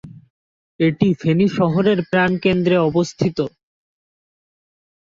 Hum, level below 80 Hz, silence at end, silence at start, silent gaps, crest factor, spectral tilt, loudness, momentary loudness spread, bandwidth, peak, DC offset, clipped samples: none; -52 dBFS; 1.55 s; 0.05 s; 0.30-0.79 s; 18 dB; -7 dB/octave; -18 LUFS; 5 LU; 7.6 kHz; -2 dBFS; under 0.1%; under 0.1%